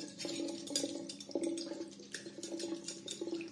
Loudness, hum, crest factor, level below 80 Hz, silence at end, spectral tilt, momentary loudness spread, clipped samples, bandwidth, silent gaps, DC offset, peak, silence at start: -41 LUFS; none; 22 dB; -86 dBFS; 0 s; -2.5 dB/octave; 8 LU; under 0.1%; 11.5 kHz; none; under 0.1%; -20 dBFS; 0 s